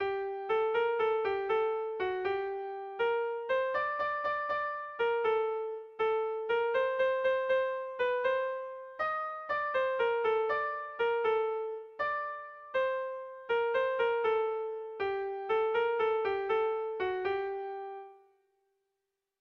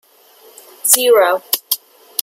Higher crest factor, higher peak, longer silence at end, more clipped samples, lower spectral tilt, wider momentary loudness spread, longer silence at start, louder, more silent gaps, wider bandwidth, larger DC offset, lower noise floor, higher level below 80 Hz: about the same, 12 dB vs 16 dB; second, -20 dBFS vs 0 dBFS; first, 1.25 s vs 0 s; neither; first, -5 dB/octave vs 1.5 dB/octave; second, 8 LU vs 11 LU; second, 0 s vs 0.85 s; second, -32 LUFS vs -14 LUFS; neither; second, 5.8 kHz vs over 20 kHz; neither; first, -86 dBFS vs -47 dBFS; about the same, -70 dBFS vs -72 dBFS